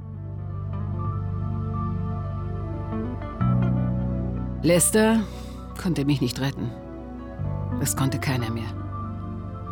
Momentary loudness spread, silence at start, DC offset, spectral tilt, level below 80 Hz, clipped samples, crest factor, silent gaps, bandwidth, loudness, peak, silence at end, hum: 13 LU; 0 s; under 0.1%; -5.5 dB/octave; -38 dBFS; under 0.1%; 16 dB; none; 19.5 kHz; -26 LUFS; -8 dBFS; 0 s; none